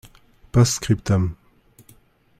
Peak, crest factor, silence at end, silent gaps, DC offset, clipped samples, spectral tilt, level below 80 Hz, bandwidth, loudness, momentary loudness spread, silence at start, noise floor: -4 dBFS; 18 dB; 1.05 s; none; under 0.1%; under 0.1%; -5.5 dB/octave; -42 dBFS; 15 kHz; -21 LUFS; 5 LU; 0.55 s; -54 dBFS